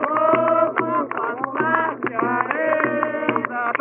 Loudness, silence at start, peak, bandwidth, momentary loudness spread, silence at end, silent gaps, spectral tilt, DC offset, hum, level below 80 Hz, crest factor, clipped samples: -21 LUFS; 0 s; -2 dBFS; 3.7 kHz; 6 LU; 0 s; none; -4 dB/octave; under 0.1%; none; -72 dBFS; 18 dB; under 0.1%